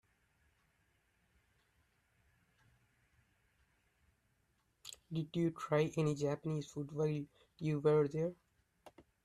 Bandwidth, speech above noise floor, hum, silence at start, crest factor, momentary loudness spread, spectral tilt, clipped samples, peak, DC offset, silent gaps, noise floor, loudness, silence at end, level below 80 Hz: 12 kHz; 42 dB; none; 4.85 s; 20 dB; 14 LU; -7 dB/octave; under 0.1%; -20 dBFS; under 0.1%; none; -79 dBFS; -37 LUFS; 0.25 s; -74 dBFS